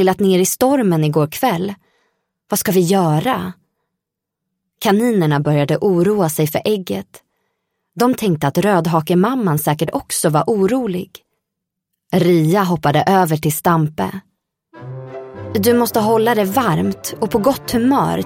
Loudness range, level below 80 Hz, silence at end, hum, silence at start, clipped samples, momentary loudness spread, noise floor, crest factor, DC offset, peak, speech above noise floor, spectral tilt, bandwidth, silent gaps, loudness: 2 LU; -52 dBFS; 0 s; none; 0 s; under 0.1%; 11 LU; -80 dBFS; 14 dB; under 0.1%; -2 dBFS; 65 dB; -5.5 dB/octave; 17 kHz; none; -16 LUFS